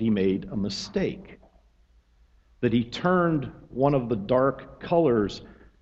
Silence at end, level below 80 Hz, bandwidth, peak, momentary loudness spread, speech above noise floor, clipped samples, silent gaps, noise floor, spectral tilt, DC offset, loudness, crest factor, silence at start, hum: 0.3 s; -52 dBFS; 8.2 kHz; -8 dBFS; 9 LU; 35 dB; under 0.1%; none; -60 dBFS; -7 dB/octave; under 0.1%; -25 LUFS; 18 dB; 0 s; none